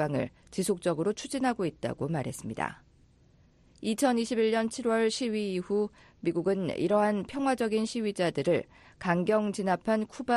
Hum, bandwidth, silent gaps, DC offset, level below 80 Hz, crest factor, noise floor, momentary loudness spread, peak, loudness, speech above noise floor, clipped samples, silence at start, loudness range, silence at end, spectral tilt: none; 11.5 kHz; none; under 0.1%; -62 dBFS; 18 dB; -61 dBFS; 8 LU; -12 dBFS; -30 LUFS; 32 dB; under 0.1%; 0 s; 4 LU; 0 s; -5.5 dB/octave